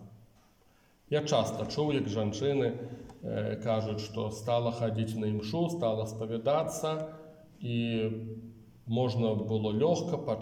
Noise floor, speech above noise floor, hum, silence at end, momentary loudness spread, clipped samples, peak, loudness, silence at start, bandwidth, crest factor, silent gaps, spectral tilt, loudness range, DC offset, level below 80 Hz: -65 dBFS; 34 dB; none; 0 s; 12 LU; under 0.1%; -14 dBFS; -32 LUFS; 0 s; 16 kHz; 18 dB; none; -6.5 dB/octave; 2 LU; under 0.1%; -64 dBFS